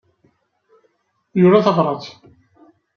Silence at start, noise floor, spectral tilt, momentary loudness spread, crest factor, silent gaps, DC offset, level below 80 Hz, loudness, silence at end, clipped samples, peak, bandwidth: 1.35 s; -64 dBFS; -8.5 dB/octave; 16 LU; 20 dB; none; under 0.1%; -64 dBFS; -16 LUFS; 0.85 s; under 0.1%; 0 dBFS; 6.6 kHz